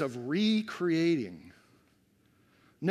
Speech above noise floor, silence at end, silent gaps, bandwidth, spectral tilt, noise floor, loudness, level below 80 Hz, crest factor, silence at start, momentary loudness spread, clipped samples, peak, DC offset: 38 dB; 0 s; none; 12 kHz; -6.5 dB/octave; -67 dBFS; -30 LUFS; -78 dBFS; 16 dB; 0 s; 12 LU; under 0.1%; -16 dBFS; under 0.1%